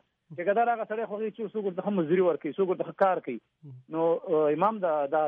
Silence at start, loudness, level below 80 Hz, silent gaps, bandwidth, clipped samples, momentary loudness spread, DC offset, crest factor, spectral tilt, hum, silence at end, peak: 0.3 s; -28 LUFS; -82 dBFS; none; 4.7 kHz; under 0.1%; 8 LU; under 0.1%; 18 dB; -6 dB/octave; none; 0 s; -10 dBFS